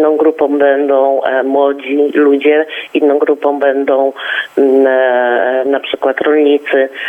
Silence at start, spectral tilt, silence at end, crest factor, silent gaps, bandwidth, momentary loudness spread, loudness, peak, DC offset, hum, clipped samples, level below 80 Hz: 0 s; -5 dB/octave; 0 s; 10 dB; none; 3.8 kHz; 5 LU; -12 LUFS; 0 dBFS; under 0.1%; none; under 0.1%; -68 dBFS